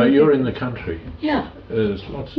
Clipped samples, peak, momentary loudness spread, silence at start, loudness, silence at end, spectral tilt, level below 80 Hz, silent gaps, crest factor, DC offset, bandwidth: under 0.1%; -4 dBFS; 14 LU; 0 s; -21 LUFS; 0 s; -9.5 dB/octave; -42 dBFS; none; 14 dB; under 0.1%; 5.6 kHz